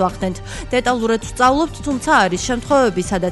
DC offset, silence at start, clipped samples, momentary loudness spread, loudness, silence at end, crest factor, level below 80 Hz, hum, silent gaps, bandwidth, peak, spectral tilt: under 0.1%; 0 s; under 0.1%; 8 LU; -17 LUFS; 0 s; 14 dB; -36 dBFS; none; none; 11.5 kHz; -2 dBFS; -4.5 dB/octave